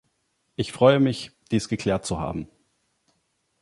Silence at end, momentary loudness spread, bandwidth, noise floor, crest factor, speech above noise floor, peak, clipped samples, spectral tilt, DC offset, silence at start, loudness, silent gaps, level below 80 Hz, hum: 1.15 s; 17 LU; 11.5 kHz; -72 dBFS; 22 dB; 50 dB; -4 dBFS; under 0.1%; -6 dB/octave; under 0.1%; 0.6 s; -24 LUFS; none; -50 dBFS; none